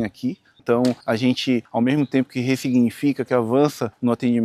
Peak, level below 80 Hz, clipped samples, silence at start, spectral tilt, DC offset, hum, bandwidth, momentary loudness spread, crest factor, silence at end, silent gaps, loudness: -4 dBFS; -66 dBFS; under 0.1%; 0 s; -6.5 dB/octave; under 0.1%; none; 14.5 kHz; 5 LU; 16 dB; 0 s; none; -21 LUFS